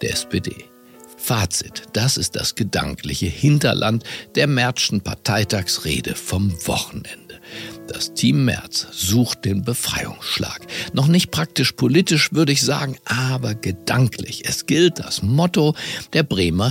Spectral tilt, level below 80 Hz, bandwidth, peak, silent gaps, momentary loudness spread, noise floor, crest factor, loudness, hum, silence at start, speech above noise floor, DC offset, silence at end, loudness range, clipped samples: -4.5 dB/octave; -44 dBFS; 17 kHz; -2 dBFS; none; 10 LU; -39 dBFS; 18 dB; -20 LUFS; none; 0 s; 20 dB; under 0.1%; 0 s; 4 LU; under 0.1%